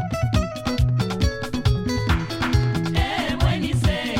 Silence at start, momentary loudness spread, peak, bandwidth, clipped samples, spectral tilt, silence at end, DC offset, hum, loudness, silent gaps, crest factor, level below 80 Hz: 0 s; 2 LU; -6 dBFS; 16 kHz; under 0.1%; -6 dB/octave; 0 s; under 0.1%; none; -22 LUFS; none; 16 dB; -28 dBFS